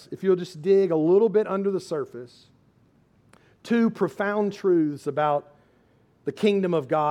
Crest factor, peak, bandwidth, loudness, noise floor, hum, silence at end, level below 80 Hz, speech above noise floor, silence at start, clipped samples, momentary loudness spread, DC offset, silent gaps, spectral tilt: 16 dB; -10 dBFS; 11 kHz; -24 LUFS; -61 dBFS; none; 0 s; -72 dBFS; 38 dB; 0.1 s; under 0.1%; 11 LU; under 0.1%; none; -7.5 dB/octave